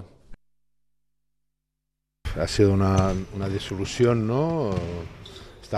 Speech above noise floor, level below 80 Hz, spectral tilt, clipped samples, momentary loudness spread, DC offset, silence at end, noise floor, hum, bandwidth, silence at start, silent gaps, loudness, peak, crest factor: 58 dB; -42 dBFS; -6.5 dB/octave; under 0.1%; 19 LU; under 0.1%; 0 s; -81 dBFS; none; 12.5 kHz; 0 s; none; -24 LUFS; -6 dBFS; 20 dB